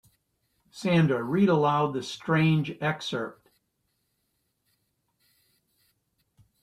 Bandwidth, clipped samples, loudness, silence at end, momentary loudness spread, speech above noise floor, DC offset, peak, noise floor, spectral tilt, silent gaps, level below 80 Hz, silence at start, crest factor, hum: 11 kHz; under 0.1%; -26 LUFS; 3.3 s; 11 LU; 51 dB; under 0.1%; -12 dBFS; -76 dBFS; -7 dB/octave; none; -66 dBFS; 0.75 s; 18 dB; none